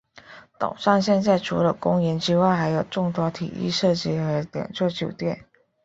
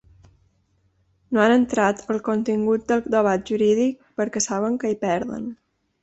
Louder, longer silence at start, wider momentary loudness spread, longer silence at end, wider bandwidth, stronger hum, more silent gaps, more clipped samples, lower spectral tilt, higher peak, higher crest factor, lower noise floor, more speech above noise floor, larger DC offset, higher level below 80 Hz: about the same, -23 LUFS vs -22 LUFS; second, 0.3 s vs 1.3 s; about the same, 10 LU vs 9 LU; about the same, 0.45 s vs 0.5 s; about the same, 8 kHz vs 8.4 kHz; neither; neither; neither; first, -6.5 dB/octave vs -4.5 dB/octave; about the same, -4 dBFS vs -6 dBFS; about the same, 20 dB vs 18 dB; second, -47 dBFS vs -65 dBFS; second, 25 dB vs 44 dB; neither; about the same, -56 dBFS vs -58 dBFS